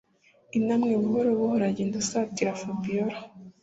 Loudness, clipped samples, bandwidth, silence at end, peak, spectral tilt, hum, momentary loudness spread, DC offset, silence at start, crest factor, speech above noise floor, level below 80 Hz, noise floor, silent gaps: -27 LUFS; under 0.1%; 8 kHz; 0.15 s; -12 dBFS; -5.5 dB/octave; none; 8 LU; under 0.1%; 0.55 s; 16 dB; 35 dB; -66 dBFS; -61 dBFS; none